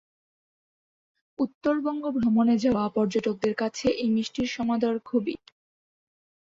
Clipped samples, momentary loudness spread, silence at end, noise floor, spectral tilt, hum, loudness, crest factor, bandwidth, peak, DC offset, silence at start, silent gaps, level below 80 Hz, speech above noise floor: under 0.1%; 7 LU; 1.15 s; under -90 dBFS; -6 dB/octave; none; -26 LUFS; 16 dB; 7.6 kHz; -12 dBFS; under 0.1%; 1.4 s; 1.55-1.61 s; -58 dBFS; over 65 dB